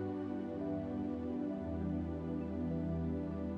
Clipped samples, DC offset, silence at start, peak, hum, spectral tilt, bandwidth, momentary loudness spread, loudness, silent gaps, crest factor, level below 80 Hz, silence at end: under 0.1%; under 0.1%; 0 s; -28 dBFS; none; -10.5 dB/octave; 6.2 kHz; 2 LU; -39 LUFS; none; 10 dB; -52 dBFS; 0 s